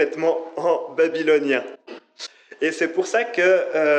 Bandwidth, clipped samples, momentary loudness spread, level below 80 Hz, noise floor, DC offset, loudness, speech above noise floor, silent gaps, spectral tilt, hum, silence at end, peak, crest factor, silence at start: 9.2 kHz; under 0.1%; 19 LU; -86 dBFS; -41 dBFS; under 0.1%; -21 LUFS; 20 dB; none; -4 dB/octave; none; 0 s; -6 dBFS; 14 dB; 0 s